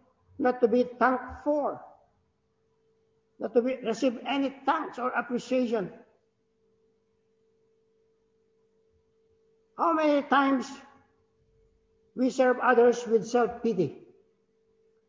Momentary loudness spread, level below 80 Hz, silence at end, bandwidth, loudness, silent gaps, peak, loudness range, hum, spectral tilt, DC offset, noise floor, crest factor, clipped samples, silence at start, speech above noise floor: 10 LU; -66 dBFS; 1.15 s; 7.8 kHz; -27 LUFS; none; -8 dBFS; 7 LU; none; -5.5 dB/octave; under 0.1%; -73 dBFS; 22 dB; under 0.1%; 0.4 s; 47 dB